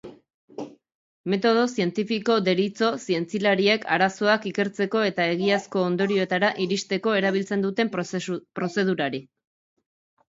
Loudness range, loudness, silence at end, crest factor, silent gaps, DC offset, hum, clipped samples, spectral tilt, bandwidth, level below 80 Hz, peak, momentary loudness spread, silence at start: 3 LU; -24 LUFS; 1.05 s; 20 dB; 0.34-0.48 s, 0.95-1.24 s; under 0.1%; none; under 0.1%; -5 dB/octave; 7.8 kHz; -70 dBFS; -4 dBFS; 9 LU; 0.05 s